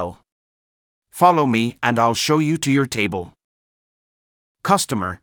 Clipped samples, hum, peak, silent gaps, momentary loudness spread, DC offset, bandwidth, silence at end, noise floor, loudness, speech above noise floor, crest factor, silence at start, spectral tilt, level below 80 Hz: under 0.1%; none; -2 dBFS; 0.32-1.02 s, 3.44-4.55 s; 14 LU; under 0.1%; over 20 kHz; 0.05 s; under -90 dBFS; -18 LUFS; over 72 dB; 20 dB; 0 s; -4.5 dB/octave; -58 dBFS